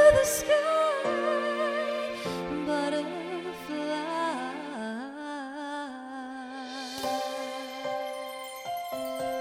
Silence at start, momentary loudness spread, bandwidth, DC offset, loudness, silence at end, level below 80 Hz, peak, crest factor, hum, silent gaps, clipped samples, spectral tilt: 0 s; 12 LU; 16.5 kHz; under 0.1%; -31 LUFS; 0 s; -56 dBFS; -8 dBFS; 20 dB; none; none; under 0.1%; -3.5 dB/octave